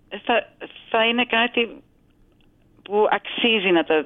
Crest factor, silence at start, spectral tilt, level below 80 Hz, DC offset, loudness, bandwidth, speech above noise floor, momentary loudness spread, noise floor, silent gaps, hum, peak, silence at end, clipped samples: 18 dB; 0.1 s; -7.5 dB/octave; -62 dBFS; under 0.1%; -20 LUFS; 4 kHz; 37 dB; 8 LU; -57 dBFS; none; none; -6 dBFS; 0 s; under 0.1%